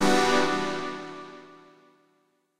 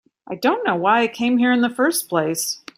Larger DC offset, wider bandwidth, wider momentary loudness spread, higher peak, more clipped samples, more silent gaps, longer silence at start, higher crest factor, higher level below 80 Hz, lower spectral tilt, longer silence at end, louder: neither; about the same, 16 kHz vs 16 kHz; first, 23 LU vs 5 LU; second, -10 dBFS vs -4 dBFS; neither; neither; second, 0 s vs 0.3 s; about the same, 18 dB vs 16 dB; first, -56 dBFS vs -66 dBFS; about the same, -3.5 dB/octave vs -3.5 dB/octave; second, 0 s vs 0.2 s; second, -26 LUFS vs -19 LUFS